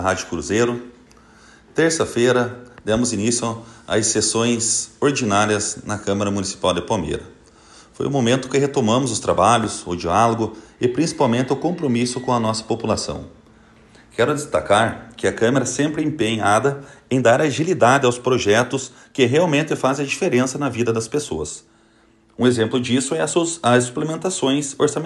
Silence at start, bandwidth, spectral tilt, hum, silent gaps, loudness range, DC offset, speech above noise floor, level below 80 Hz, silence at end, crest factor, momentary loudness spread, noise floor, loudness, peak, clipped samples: 0 s; 12.5 kHz; -4.5 dB/octave; none; none; 4 LU; under 0.1%; 35 dB; -50 dBFS; 0 s; 18 dB; 8 LU; -55 dBFS; -19 LUFS; -2 dBFS; under 0.1%